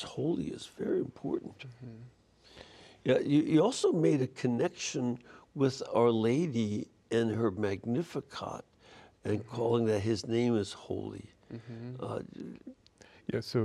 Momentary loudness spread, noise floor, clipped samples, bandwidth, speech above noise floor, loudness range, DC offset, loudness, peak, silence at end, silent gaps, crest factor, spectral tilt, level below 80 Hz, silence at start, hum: 20 LU; -58 dBFS; under 0.1%; 12 kHz; 26 dB; 6 LU; under 0.1%; -32 LUFS; -14 dBFS; 0 s; none; 18 dB; -6.5 dB/octave; -68 dBFS; 0 s; none